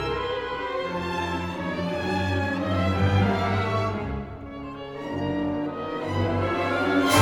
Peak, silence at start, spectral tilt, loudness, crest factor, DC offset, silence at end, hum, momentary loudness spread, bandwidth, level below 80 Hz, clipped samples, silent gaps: -6 dBFS; 0 s; -6 dB/octave; -26 LUFS; 20 dB; under 0.1%; 0 s; none; 11 LU; 18 kHz; -46 dBFS; under 0.1%; none